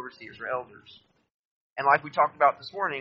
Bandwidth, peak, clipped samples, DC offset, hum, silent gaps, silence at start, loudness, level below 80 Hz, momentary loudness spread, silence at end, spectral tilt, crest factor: 7 kHz; -6 dBFS; under 0.1%; under 0.1%; none; 1.31-1.76 s; 0 s; -26 LUFS; -76 dBFS; 19 LU; 0 s; -1.5 dB/octave; 22 dB